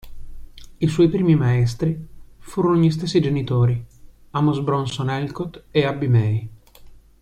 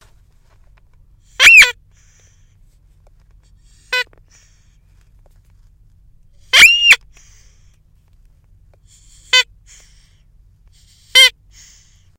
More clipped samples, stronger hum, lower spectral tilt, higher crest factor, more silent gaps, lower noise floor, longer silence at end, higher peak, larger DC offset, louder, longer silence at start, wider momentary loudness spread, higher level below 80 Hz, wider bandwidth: second, under 0.1% vs 0.2%; neither; first, -7.5 dB/octave vs 2 dB/octave; about the same, 16 dB vs 18 dB; neither; second, -44 dBFS vs -51 dBFS; second, 0.3 s vs 0.9 s; second, -6 dBFS vs 0 dBFS; neither; second, -20 LUFS vs -8 LUFS; second, 0.05 s vs 1.4 s; second, 11 LU vs 16 LU; about the same, -44 dBFS vs -48 dBFS; second, 10.5 kHz vs 17 kHz